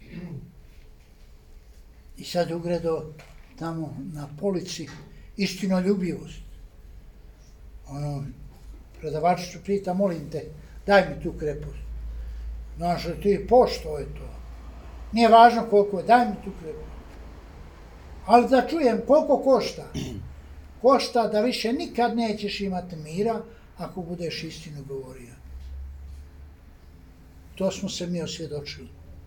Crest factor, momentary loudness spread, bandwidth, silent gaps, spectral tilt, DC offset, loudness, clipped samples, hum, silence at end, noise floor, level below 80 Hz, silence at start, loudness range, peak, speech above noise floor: 22 dB; 23 LU; 19 kHz; none; -5.5 dB/octave; under 0.1%; -24 LUFS; under 0.1%; none; 0 s; -49 dBFS; -44 dBFS; 0 s; 13 LU; -2 dBFS; 26 dB